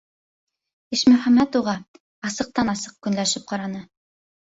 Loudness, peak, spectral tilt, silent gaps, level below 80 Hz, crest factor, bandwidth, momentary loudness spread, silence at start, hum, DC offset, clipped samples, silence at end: -21 LUFS; -4 dBFS; -4 dB/octave; 1.88-1.94 s, 2.00-2.22 s; -58 dBFS; 20 dB; 8 kHz; 15 LU; 0.9 s; none; under 0.1%; under 0.1%; 0.75 s